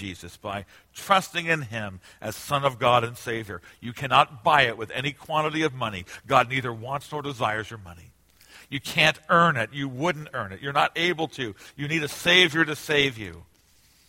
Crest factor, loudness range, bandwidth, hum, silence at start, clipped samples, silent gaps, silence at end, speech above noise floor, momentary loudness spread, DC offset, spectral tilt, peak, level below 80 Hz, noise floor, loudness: 24 dB; 4 LU; 16.5 kHz; none; 0 s; under 0.1%; none; 0.65 s; 34 dB; 17 LU; under 0.1%; -4 dB/octave; -2 dBFS; -58 dBFS; -60 dBFS; -24 LUFS